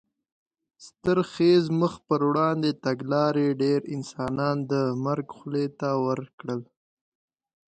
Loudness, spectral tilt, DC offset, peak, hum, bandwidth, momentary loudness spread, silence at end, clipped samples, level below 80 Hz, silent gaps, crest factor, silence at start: -26 LUFS; -7.5 dB/octave; under 0.1%; -10 dBFS; none; 9 kHz; 10 LU; 1.1 s; under 0.1%; -64 dBFS; 6.33-6.38 s; 16 dB; 0.8 s